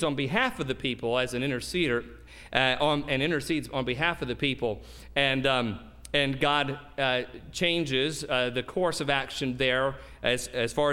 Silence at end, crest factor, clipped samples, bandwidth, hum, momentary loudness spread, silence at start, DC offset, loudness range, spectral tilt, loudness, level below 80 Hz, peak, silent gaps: 0 s; 22 dB; under 0.1%; 16.5 kHz; none; 7 LU; 0 s; under 0.1%; 1 LU; -4.5 dB/octave; -28 LUFS; -50 dBFS; -6 dBFS; none